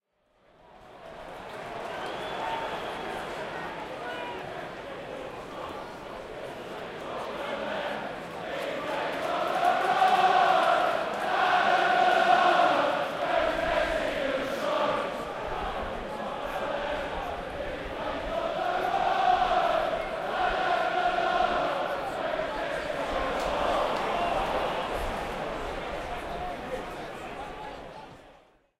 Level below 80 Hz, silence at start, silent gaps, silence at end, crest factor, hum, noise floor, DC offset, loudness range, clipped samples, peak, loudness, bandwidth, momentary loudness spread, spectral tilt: -48 dBFS; 0.75 s; none; 0.45 s; 20 dB; none; -66 dBFS; under 0.1%; 13 LU; under 0.1%; -10 dBFS; -28 LUFS; 15 kHz; 16 LU; -4 dB/octave